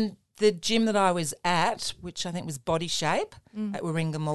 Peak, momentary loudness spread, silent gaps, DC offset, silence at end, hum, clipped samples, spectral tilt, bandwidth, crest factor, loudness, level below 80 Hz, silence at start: -10 dBFS; 10 LU; none; 0.4%; 0 s; none; under 0.1%; -4.5 dB/octave; 12.5 kHz; 18 dB; -27 LUFS; -60 dBFS; 0 s